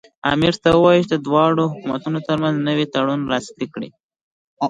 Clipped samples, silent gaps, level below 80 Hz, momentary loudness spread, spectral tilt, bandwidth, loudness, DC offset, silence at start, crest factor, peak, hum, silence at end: under 0.1%; 4.03-4.09 s, 4.21-4.57 s; -50 dBFS; 14 LU; -6.5 dB/octave; 9.4 kHz; -18 LUFS; under 0.1%; 0.25 s; 16 dB; -2 dBFS; none; 0 s